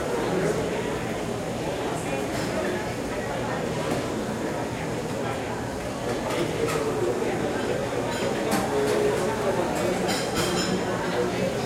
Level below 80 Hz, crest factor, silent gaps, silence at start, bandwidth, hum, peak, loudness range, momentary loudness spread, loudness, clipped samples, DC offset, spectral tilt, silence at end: -48 dBFS; 14 dB; none; 0 s; 16.5 kHz; none; -12 dBFS; 4 LU; 5 LU; -27 LUFS; under 0.1%; under 0.1%; -5 dB/octave; 0 s